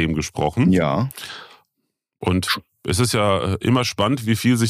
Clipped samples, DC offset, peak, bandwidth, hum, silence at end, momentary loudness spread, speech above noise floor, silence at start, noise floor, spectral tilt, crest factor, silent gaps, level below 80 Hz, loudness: under 0.1%; under 0.1%; -6 dBFS; 15.5 kHz; none; 0 s; 10 LU; 57 dB; 0 s; -76 dBFS; -5.5 dB/octave; 14 dB; none; -44 dBFS; -20 LUFS